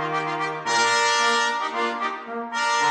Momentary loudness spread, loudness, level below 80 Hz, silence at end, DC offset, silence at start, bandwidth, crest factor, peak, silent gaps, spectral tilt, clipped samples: 9 LU; -22 LUFS; -78 dBFS; 0 s; under 0.1%; 0 s; 10 kHz; 16 dB; -8 dBFS; none; -1.5 dB/octave; under 0.1%